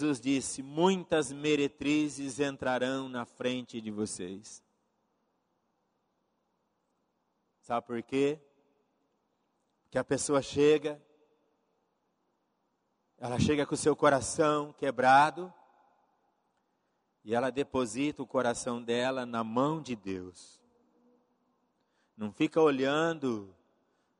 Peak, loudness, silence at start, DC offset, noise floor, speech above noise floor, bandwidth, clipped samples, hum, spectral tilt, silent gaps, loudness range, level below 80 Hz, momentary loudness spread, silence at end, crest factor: -10 dBFS; -30 LUFS; 0 s; under 0.1%; -78 dBFS; 48 dB; 11 kHz; under 0.1%; none; -4.5 dB/octave; none; 10 LU; -64 dBFS; 14 LU; 0.7 s; 22 dB